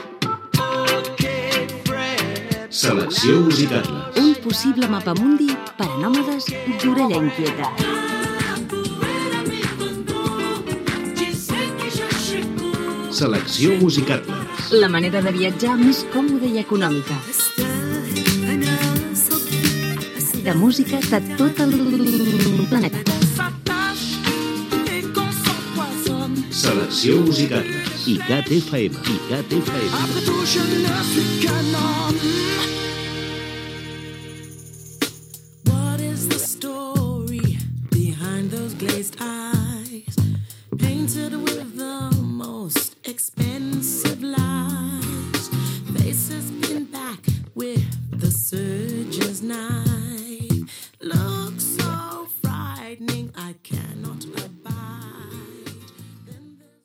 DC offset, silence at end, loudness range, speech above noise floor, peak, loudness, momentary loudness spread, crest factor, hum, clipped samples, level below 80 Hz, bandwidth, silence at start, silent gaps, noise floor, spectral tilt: under 0.1%; 0.3 s; 7 LU; 28 dB; 0 dBFS; -21 LUFS; 12 LU; 20 dB; none; under 0.1%; -50 dBFS; 17 kHz; 0 s; none; -47 dBFS; -4.5 dB/octave